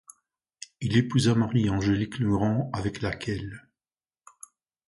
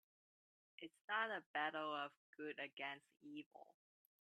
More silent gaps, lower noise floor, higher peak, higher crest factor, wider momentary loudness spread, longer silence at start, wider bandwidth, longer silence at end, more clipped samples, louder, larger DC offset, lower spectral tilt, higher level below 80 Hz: second, none vs 1.04-1.08 s, 1.46-1.54 s, 2.17-2.33 s, 2.73-2.77 s, 3.46-3.51 s; about the same, under -90 dBFS vs under -90 dBFS; first, -10 dBFS vs -28 dBFS; about the same, 18 dB vs 22 dB; about the same, 17 LU vs 16 LU; about the same, 0.8 s vs 0.8 s; about the same, 11.5 kHz vs 11.5 kHz; first, 1.3 s vs 0.5 s; neither; first, -26 LUFS vs -47 LUFS; neither; first, -6.5 dB/octave vs -4.5 dB/octave; first, -50 dBFS vs under -90 dBFS